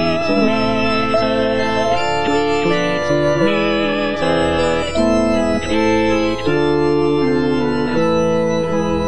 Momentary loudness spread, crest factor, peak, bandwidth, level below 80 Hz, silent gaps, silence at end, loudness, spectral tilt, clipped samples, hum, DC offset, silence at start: 2 LU; 12 dB; -4 dBFS; 10 kHz; -38 dBFS; none; 0 s; -16 LUFS; -5.5 dB/octave; under 0.1%; none; 4%; 0 s